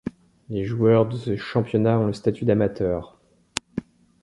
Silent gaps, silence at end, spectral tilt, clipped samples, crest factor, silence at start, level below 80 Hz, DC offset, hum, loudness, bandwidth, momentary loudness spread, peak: none; 0.4 s; -7 dB/octave; under 0.1%; 22 dB; 0.05 s; -50 dBFS; under 0.1%; none; -23 LUFS; 11.5 kHz; 13 LU; 0 dBFS